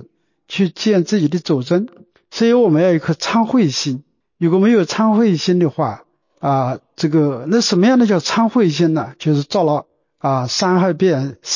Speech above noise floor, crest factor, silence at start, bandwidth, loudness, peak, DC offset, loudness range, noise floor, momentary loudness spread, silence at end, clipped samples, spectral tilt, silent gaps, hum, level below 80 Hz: 33 dB; 12 dB; 0 s; 7.4 kHz; -16 LUFS; -4 dBFS; under 0.1%; 1 LU; -48 dBFS; 9 LU; 0 s; under 0.1%; -6 dB/octave; none; none; -62 dBFS